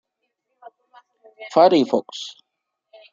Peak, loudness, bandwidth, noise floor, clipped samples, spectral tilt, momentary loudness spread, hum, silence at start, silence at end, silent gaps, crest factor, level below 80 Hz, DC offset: -2 dBFS; -18 LUFS; 7.6 kHz; -79 dBFS; under 0.1%; -5.5 dB/octave; 20 LU; none; 1.4 s; 0.85 s; none; 22 dB; -70 dBFS; under 0.1%